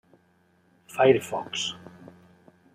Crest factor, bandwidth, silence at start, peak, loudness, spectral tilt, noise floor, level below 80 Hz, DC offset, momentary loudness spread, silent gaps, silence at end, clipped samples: 22 dB; 15.5 kHz; 0.9 s; -6 dBFS; -25 LUFS; -4 dB/octave; -64 dBFS; -72 dBFS; under 0.1%; 22 LU; none; 0.95 s; under 0.1%